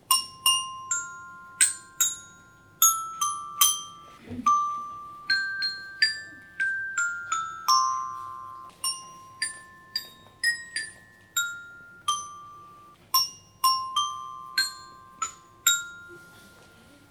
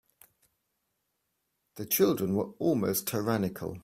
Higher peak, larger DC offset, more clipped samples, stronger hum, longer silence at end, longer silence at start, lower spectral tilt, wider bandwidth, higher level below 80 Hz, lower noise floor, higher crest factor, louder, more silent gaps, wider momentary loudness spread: first, -4 dBFS vs -12 dBFS; neither; neither; neither; first, 0.45 s vs 0.05 s; second, 0.1 s vs 1.75 s; second, 2 dB/octave vs -5 dB/octave; first, over 20 kHz vs 16 kHz; about the same, -68 dBFS vs -66 dBFS; second, -54 dBFS vs -80 dBFS; first, 26 dB vs 20 dB; first, -26 LUFS vs -29 LUFS; neither; first, 20 LU vs 6 LU